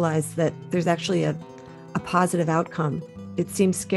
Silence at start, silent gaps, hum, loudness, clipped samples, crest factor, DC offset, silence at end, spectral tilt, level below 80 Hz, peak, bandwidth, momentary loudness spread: 0 s; none; none; -25 LUFS; under 0.1%; 18 dB; under 0.1%; 0 s; -6 dB/octave; -60 dBFS; -6 dBFS; 13 kHz; 11 LU